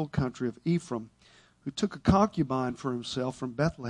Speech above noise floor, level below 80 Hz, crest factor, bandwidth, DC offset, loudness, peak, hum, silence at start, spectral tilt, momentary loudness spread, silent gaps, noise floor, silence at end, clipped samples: 31 dB; -50 dBFS; 22 dB; 11 kHz; under 0.1%; -30 LUFS; -8 dBFS; none; 0 s; -6.5 dB/octave; 13 LU; none; -60 dBFS; 0 s; under 0.1%